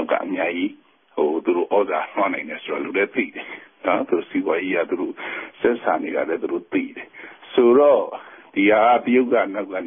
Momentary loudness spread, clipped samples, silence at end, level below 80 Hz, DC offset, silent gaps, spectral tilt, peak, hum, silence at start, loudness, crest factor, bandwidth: 14 LU; under 0.1%; 0 s; -66 dBFS; under 0.1%; none; -10 dB/octave; -4 dBFS; none; 0 s; -21 LUFS; 16 dB; 3.7 kHz